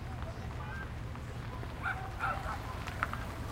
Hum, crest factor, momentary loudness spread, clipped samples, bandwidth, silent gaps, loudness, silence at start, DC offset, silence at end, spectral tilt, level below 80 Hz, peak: none; 24 dB; 6 LU; under 0.1%; 16 kHz; none; -39 LUFS; 0 s; under 0.1%; 0 s; -5.5 dB/octave; -46 dBFS; -14 dBFS